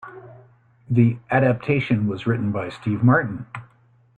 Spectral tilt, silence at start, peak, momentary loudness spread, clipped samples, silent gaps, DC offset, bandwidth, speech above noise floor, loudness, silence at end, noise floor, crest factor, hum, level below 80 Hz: -9.5 dB/octave; 0.05 s; -4 dBFS; 16 LU; under 0.1%; none; under 0.1%; 4.5 kHz; 32 dB; -21 LUFS; 0.55 s; -53 dBFS; 18 dB; none; -56 dBFS